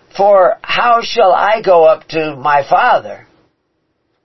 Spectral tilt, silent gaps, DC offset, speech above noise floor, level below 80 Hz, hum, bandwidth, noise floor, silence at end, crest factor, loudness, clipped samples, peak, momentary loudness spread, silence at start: -4.5 dB/octave; none; 1%; 54 dB; -52 dBFS; none; 6.2 kHz; -65 dBFS; 1.1 s; 12 dB; -11 LUFS; under 0.1%; 0 dBFS; 7 LU; 0.15 s